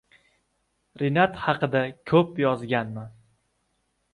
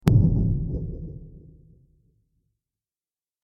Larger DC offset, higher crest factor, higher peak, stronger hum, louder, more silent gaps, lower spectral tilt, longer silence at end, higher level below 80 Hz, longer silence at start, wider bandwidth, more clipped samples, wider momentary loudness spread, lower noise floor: neither; about the same, 20 dB vs 24 dB; second, -8 dBFS vs -2 dBFS; neither; about the same, -24 LUFS vs -24 LUFS; neither; about the same, -8 dB/octave vs -9 dB/octave; second, 1.05 s vs 2.05 s; second, -60 dBFS vs -34 dBFS; first, 1 s vs 0.05 s; about the same, 11 kHz vs 11.5 kHz; neither; second, 12 LU vs 21 LU; second, -73 dBFS vs under -90 dBFS